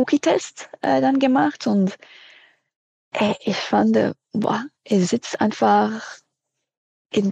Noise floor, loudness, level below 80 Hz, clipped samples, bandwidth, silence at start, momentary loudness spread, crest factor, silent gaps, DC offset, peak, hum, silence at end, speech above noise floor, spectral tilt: -80 dBFS; -21 LUFS; -68 dBFS; under 0.1%; 9.4 kHz; 0 s; 10 LU; 18 dB; 2.76-3.12 s, 6.77-7.05 s; under 0.1%; -4 dBFS; none; 0 s; 60 dB; -5.5 dB/octave